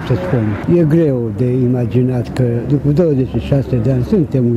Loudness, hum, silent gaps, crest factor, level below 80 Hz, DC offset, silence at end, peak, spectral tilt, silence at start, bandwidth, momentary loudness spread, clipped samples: -15 LUFS; none; none; 12 dB; -34 dBFS; under 0.1%; 0 s; 0 dBFS; -9.5 dB/octave; 0 s; 10.5 kHz; 4 LU; under 0.1%